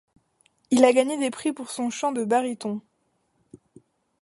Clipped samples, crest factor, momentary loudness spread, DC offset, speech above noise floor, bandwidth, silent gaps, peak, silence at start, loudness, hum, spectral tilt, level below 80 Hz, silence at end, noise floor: under 0.1%; 22 dB; 13 LU; under 0.1%; 48 dB; 11.5 kHz; none; -2 dBFS; 0.7 s; -24 LUFS; none; -4 dB/octave; -76 dBFS; 0.65 s; -71 dBFS